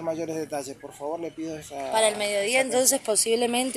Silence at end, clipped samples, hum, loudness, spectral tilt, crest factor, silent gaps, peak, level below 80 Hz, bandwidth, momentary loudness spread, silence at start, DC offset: 0 s; under 0.1%; none; -24 LUFS; -1.5 dB/octave; 20 dB; none; -6 dBFS; -66 dBFS; 16 kHz; 14 LU; 0 s; under 0.1%